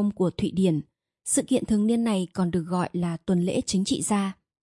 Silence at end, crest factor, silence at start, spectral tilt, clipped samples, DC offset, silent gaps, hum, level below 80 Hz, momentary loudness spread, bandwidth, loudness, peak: 0.3 s; 14 dB; 0 s; -5.5 dB/octave; under 0.1%; under 0.1%; none; none; -54 dBFS; 5 LU; 11.5 kHz; -25 LUFS; -10 dBFS